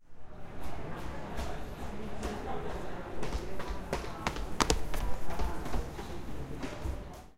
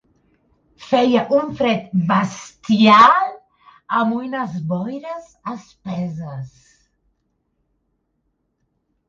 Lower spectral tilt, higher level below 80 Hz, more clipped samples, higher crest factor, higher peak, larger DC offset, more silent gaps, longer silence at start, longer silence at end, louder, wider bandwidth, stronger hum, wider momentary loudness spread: second, -4.5 dB/octave vs -6 dB/octave; first, -40 dBFS vs -60 dBFS; neither; first, 28 dB vs 20 dB; second, -4 dBFS vs 0 dBFS; neither; neither; second, 0 s vs 0.8 s; second, 0.05 s vs 2.6 s; second, -38 LUFS vs -17 LUFS; first, 16 kHz vs 7.6 kHz; neither; second, 10 LU vs 20 LU